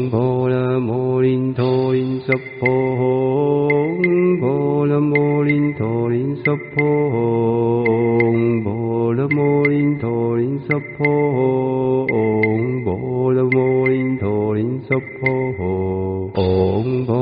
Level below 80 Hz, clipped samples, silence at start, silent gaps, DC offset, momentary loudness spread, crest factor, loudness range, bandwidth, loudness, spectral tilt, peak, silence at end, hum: -52 dBFS; under 0.1%; 0 s; none; under 0.1%; 5 LU; 16 dB; 2 LU; 5 kHz; -18 LUFS; -7.5 dB/octave; -2 dBFS; 0 s; none